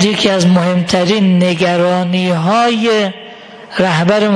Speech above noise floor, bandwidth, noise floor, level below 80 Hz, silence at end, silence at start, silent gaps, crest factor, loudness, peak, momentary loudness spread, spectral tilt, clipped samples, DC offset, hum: 22 dB; 10.5 kHz; -33 dBFS; -52 dBFS; 0 s; 0 s; none; 12 dB; -12 LUFS; 0 dBFS; 6 LU; -5.5 dB/octave; under 0.1%; under 0.1%; none